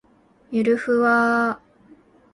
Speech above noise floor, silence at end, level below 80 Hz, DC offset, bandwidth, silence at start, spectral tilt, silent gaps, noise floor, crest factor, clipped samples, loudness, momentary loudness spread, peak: 33 dB; 0.75 s; -64 dBFS; under 0.1%; 11 kHz; 0.5 s; -6.5 dB/octave; none; -52 dBFS; 14 dB; under 0.1%; -20 LUFS; 10 LU; -8 dBFS